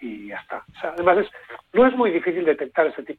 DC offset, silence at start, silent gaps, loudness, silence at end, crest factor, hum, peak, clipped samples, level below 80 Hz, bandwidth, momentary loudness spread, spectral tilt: under 0.1%; 0 s; none; -21 LUFS; 0.05 s; 16 dB; none; -4 dBFS; under 0.1%; -58 dBFS; 4.4 kHz; 16 LU; -7.5 dB/octave